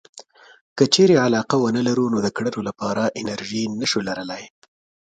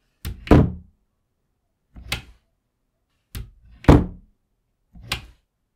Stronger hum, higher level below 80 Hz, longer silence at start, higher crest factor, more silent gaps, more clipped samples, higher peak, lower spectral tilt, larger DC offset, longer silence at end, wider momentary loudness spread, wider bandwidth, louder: neither; second, -60 dBFS vs -32 dBFS; about the same, 0.15 s vs 0.25 s; about the same, 20 dB vs 24 dB; first, 0.61-0.76 s vs none; neither; about the same, -2 dBFS vs 0 dBFS; second, -4.5 dB/octave vs -7 dB/octave; neither; about the same, 0.6 s vs 0.55 s; second, 13 LU vs 23 LU; second, 9.2 kHz vs 16 kHz; about the same, -20 LUFS vs -20 LUFS